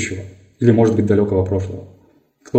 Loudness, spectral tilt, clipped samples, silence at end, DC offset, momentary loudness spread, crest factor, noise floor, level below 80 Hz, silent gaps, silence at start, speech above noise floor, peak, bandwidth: -17 LUFS; -7.5 dB/octave; under 0.1%; 0 s; under 0.1%; 16 LU; 18 dB; -53 dBFS; -54 dBFS; none; 0 s; 37 dB; 0 dBFS; 8.8 kHz